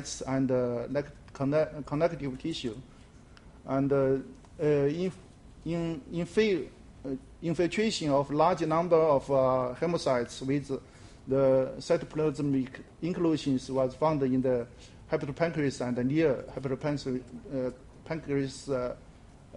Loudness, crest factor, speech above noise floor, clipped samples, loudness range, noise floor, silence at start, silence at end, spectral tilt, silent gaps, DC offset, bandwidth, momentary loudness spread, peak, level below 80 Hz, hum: -30 LUFS; 18 dB; 24 dB; under 0.1%; 5 LU; -53 dBFS; 0 s; 0 s; -6.5 dB/octave; none; under 0.1%; 11.5 kHz; 13 LU; -12 dBFS; -54 dBFS; none